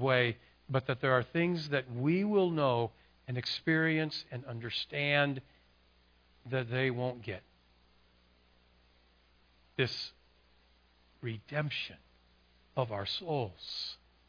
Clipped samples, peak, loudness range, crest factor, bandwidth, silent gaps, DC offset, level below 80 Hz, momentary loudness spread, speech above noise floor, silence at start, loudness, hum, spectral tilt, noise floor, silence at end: under 0.1%; -12 dBFS; 10 LU; 22 dB; 5.2 kHz; none; under 0.1%; -68 dBFS; 14 LU; 34 dB; 0 s; -34 LUFS; none; -7 dB/octave; -67 dBFS; 0.35 s